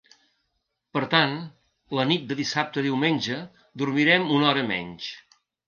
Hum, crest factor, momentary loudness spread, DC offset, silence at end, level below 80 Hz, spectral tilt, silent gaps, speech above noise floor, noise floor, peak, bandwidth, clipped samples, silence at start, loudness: none; 20 dB; 16 LU; under 0.1%; 0.45 s; -68 dBFS; -5 dB/octave; none; 53 dB; -77 dBFS; -6 dBFS; 7.2 kHz; under 0.1%; 0.95 s; -24 LUFS